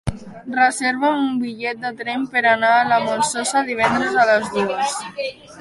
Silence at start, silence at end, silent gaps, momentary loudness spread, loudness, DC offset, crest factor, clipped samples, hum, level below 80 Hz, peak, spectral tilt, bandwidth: 0.05 s; 0 s; none; 11 LU; -19 LUFS; under 0.1%; 16 dB; under 0.1%; none; -46 dBFS; -4 dBFS; -3.5 dB/octave; 11.5 kHz